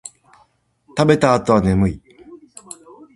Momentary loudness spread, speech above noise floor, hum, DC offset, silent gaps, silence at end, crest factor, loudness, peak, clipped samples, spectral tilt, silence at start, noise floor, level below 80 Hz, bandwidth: 23 LU; 44 dB; none; under 0.1%; none; 0.8 s; 20 dB; -16 LUFS; 0 dBFS; under 0.1%; -6.5 dB/octave; 0.05 s; -59 dBFS; -38 dBFS; 11.5 kHz